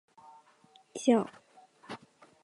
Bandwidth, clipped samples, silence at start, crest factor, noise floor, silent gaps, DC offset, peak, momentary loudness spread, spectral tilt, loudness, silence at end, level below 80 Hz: 11.5 kHz; under 0.1%; 0.95 s; 22 dB; -63 dBFS; none; under 0.1%; -12 dBFS; 20 LU; -5 dB/octave; -29 LUFS; 0.45 s; -82 dBFS